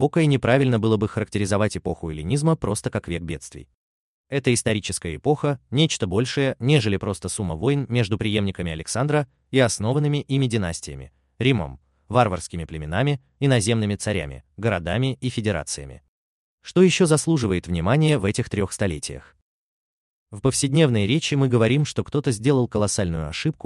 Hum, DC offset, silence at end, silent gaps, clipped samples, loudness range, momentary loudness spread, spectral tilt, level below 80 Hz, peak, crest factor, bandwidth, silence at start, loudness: none; under 0.1%; 0.15 s; 3.74-4.24 s, 16.08-16.58 s, 19.42-20.26 s; under 0.1%; 4 LU; 11 LU; -5.5 dB/octave; -48 dBFS; -4 dBFS; 18 dB; 12.5 kHz; 0 s; -22 LUFS